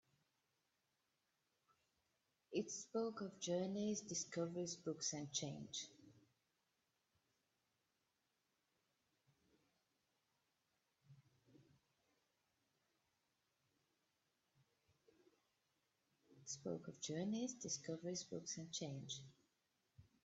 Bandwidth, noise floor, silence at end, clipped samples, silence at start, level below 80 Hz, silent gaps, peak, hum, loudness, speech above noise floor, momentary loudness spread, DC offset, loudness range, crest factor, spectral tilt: 8.2 kHz; -88 dBFS; 0.2 s; under 0.1%; 2.5 s; -88 dBFS; none; -30 dBFS; none; -47 LUFS; 41 dB; 7 LU; under 0.1%; 11 LU; 22 dB; -4 dB/octave